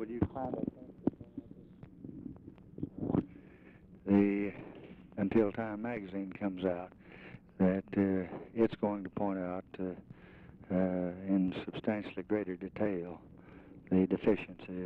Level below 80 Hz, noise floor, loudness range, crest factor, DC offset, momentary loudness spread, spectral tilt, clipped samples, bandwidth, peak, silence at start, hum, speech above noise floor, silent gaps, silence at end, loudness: -62 dBFS; -57 dBFS; 4 LU; 18 dB; under 0.1%; 22 LU; -10.5 dB/octave; under 0.1%; 4.5 kHz; -18 dBFS; 0 s; none; 23 dB; none; 0 s; -35 LUFS